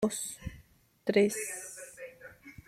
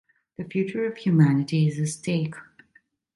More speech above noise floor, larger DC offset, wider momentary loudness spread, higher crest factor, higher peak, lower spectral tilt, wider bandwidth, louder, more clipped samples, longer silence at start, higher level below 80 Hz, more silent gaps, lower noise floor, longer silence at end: second, 30 dB vs 39 dB; neither; about the same, 20 LU vs 18 LU; about the same, 22 dB vs 18 dB; second, -12 dBFS vs -8 dBFS; second, -4 dB/octave vs -7 dB/octave; first, 15.5 kHz vs 11.5 kHz; second, -32 LUFS vs -24 LUFS; neither; second, 0 s vs 0.4 s; first, -58 dBFS vs -66 dBFS; neither; about the same, -61 dBFS vs -63 dBFS; second, 0.15 s vs 0.75 s